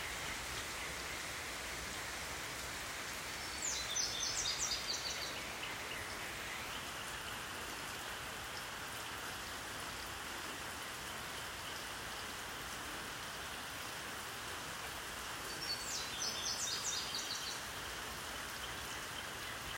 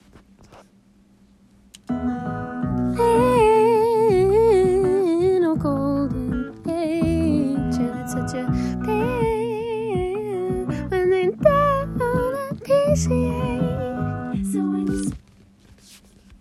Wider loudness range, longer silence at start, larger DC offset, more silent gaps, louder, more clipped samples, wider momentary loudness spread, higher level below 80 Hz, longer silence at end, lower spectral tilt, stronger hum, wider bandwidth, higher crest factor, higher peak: about the same, 5 LU vs 6 LU; second, 0 s vs 0.5 s; neither; neither; second, -41 LUFS vs -21 LUFS; neither; second, 7 LU vs 10 LU; second, -60 dBFS vs -40 dBFS; second, 0 s vs 0.45 s; second, -1 dB/octave vs -7 dB/octave; neither; first, 16 kHz vs 13.5 kHz; about the same, 20 dB vs 18 dB; second, -24 dBFS vs -2 dBFS